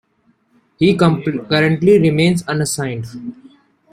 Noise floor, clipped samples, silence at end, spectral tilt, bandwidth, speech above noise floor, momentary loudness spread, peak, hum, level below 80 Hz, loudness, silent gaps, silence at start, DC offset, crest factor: -60 dBFS; under 0.1%; 0.6 s; -6 dB/octave; 14.5 kHz; 45 dB; 16 LU; -2 dBFS; none; -50 dBFS; -15 LUFS; none; 0.8 s; under 0.1%; 16 dB